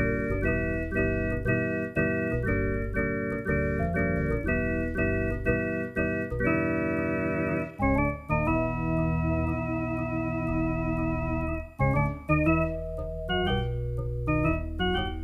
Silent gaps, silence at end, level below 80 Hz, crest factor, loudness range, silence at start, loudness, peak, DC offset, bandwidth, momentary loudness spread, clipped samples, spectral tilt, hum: none; 0 s; -36 dBFS; 16 dB; 1 LU; 0 s; -28 LUFS; -10 dBFS; under 0.1%; 12.5 kHz; 4 LU; under 0.1%; -8.5 dB/octave; none